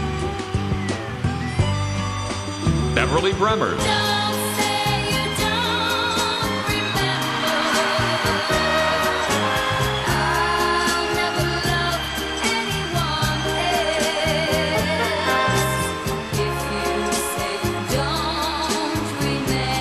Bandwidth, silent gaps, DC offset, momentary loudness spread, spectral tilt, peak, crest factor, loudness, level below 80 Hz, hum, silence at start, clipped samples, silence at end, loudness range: 15 kHz; none; 0.1%; 5 LU; -4 dB/octave; -2 dBFS; 20 dB; -21 LUFS; -36 dBFS; none; 0 s; under 0.1%; 0 s; 3 LU